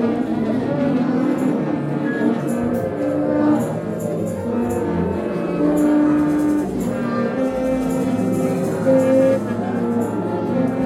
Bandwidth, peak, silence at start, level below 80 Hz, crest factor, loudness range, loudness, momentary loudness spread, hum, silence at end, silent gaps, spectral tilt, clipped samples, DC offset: 15 kHz; -4 dBFS; 0 s; -48 dBFS; 14 dB; 2 LU; -20 LUFS; 6 LU; none; 0 s; none; -8 dB/octave; under 0.1%; under 0.1%